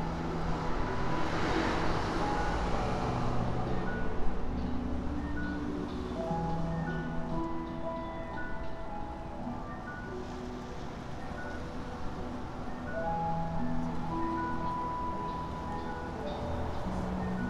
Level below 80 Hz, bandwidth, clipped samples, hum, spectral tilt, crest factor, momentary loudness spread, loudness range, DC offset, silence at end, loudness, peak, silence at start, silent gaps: -40 dBFS; 10.5 kHz; under 0.1%; none; -7 dB/octave; 18 dB; 8 LU; 8 LU; under 0.1%; 0 s; -36 LUFS; -16 dBFS; 0 s; none